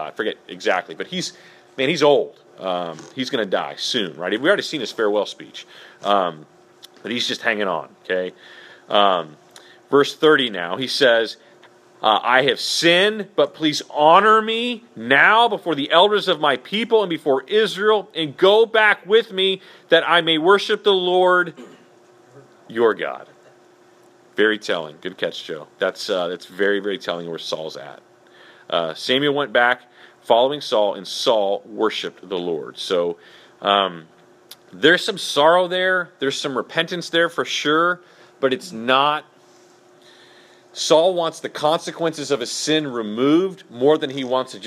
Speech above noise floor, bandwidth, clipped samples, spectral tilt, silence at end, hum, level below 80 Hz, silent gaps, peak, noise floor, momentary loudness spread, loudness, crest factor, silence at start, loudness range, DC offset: 32 dB; 14.5 kHz; under 0.1%; -3.5 dB/octave; 0 s; none; -76 dBFS; none; 0 dBFS; -51 dBFS; 12 LU; -19 LUFS; 20 dB; 0 s; 8 LU; under 0.1%